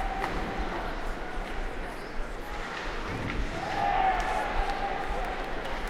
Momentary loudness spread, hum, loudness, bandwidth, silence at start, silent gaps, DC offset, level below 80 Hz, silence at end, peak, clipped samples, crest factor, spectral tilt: 11 LU; none; -32 LUFS; 13.5 kHz; 0 s; none; under 0.1%; -36 dBFS; 0 s; -14 dBFS; under 0.1%; 16 dB; -5 dB/octave